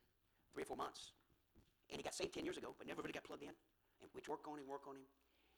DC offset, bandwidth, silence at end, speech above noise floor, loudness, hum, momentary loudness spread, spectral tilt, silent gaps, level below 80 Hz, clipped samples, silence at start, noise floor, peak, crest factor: under 0.1%; 19.5 kHz; 0.5 s; 29 dB; -51 LUFS; none; 14 LU; -3.5 dB/octave; none; -78 dBFS; under 0.1%; 0.55 s; -80 dBFS; -32 dBFS; 22 dB